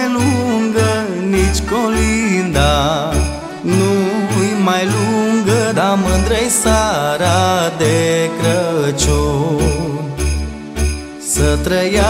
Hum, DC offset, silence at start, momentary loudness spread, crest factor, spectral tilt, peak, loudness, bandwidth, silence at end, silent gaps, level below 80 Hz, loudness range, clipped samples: none; under 0.1%; 0 s; 6 LU; 14 dB; -5 dB/octave; 0 dBFS; -15 LUFS; 16 kHz; 0 s; none; -24 dBFS; 3 LU; under 0.1%